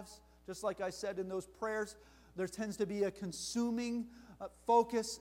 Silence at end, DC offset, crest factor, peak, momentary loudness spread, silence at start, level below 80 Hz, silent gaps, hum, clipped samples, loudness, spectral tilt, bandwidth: 0 s; under 0.1%; 20 dB; -18 dBFS; 18 LU; 0 s; -66 dBFS; none; none; under 0.1%; -38 LUFS; -4.5 dB/octave; 16 kHz